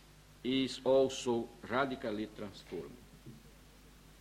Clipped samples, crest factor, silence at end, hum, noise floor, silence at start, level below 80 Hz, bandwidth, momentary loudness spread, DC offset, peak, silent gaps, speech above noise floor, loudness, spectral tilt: under 0.1%; 20 dB; 0.1 s; none; -59 dBFS; 0.45 s; -62 dBFS; 16 kHz; 24 LU; under 0.1%; -18 dBFS; none; 24 dB; -35 LUFS; -4.5 dB/octave